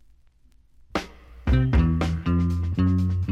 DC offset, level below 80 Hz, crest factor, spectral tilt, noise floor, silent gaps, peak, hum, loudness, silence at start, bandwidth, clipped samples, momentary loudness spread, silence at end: under 0.1%; -30 dBFS; 14 dB; -8 dB/octave; -56 dBFS; none; -10 dBFS; none; -24 LUFS; 0.95 s; 8 kHz; under 0.1%; 11 LU; 0 s